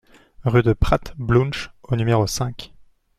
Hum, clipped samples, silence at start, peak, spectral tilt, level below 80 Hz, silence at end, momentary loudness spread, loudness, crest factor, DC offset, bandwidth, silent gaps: none; under 0.1%; 0.4 s; -2 dBFS; -6 dB/octave; -32 dBFS; 0.55 s; 10 LU; -21 LUFS; 20 dB; under 0.1%; 14 kHz; none